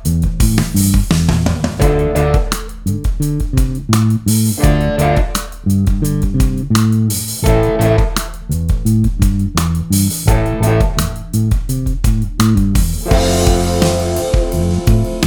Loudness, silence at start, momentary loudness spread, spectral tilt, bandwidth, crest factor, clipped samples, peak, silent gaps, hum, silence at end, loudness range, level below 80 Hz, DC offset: -15 LUFS; 0 s; 5 LU; -6 dB/octave; over 20 kHz; 14 dB; under 0.1%; 0 dBFS; none; none; 0 s; 1 LU; -18 dBFS; under 0.1%